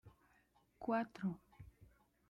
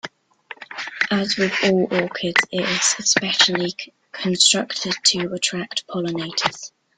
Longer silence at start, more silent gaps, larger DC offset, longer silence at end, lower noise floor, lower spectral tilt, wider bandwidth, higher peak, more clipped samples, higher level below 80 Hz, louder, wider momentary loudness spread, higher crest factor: about the same, 0.05 s vs 0.05 s; neither; neither; first, 0.45 s vs 0.3 s; first, -75 dBFS vs -43 dBFS; first, -8.5 dB/octave vs -2 dB/octave; about the same, 11.5 kHz vs 11 kHz; second, -28 dBFS vs 0 dBFS; neither; second, -72 dBFS vs -62 dBFS; second, -43 LUFS vs -19 LUFS; first, 22 LU vs 16 LU; about the same, 18 dB vs 22 dB